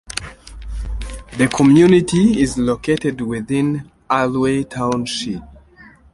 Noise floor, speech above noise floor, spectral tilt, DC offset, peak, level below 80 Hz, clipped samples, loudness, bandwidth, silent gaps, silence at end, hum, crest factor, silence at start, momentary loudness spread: -45 dBFS; 30 dB; -6 dB/octave; under 0.1%; -2 dBFS; -34 dBFS; under 0.1%; -16 LUFS; 11.5 kHz; none; 0.65 s; none; 16 dB; 0.1 s; 18 LU